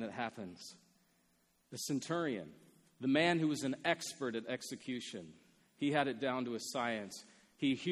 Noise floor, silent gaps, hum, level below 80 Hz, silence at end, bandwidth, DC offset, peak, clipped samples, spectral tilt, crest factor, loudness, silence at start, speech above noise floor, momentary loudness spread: -75 dBFS; none; none; -80 dBFS; 0 s; 13.5 kHz; under 0.1%; -16 dBFS; under 0.1%; -4.5 dB/octave; 22 dB; -37 LUFS; 0 s; 37 dB; 17 LU